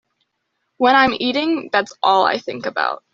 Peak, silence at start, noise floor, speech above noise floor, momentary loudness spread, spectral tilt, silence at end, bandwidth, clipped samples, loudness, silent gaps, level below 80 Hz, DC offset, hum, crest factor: -2 dBFS; 0.8 s; -73 dBFS; 55 dB; 9 LU; -0.5 dB/octave; 0.15 s; 7.6 kHz; under 0.1%; -17 LUFS; none; -58 dBFS; under 0.1%; none; 16 dB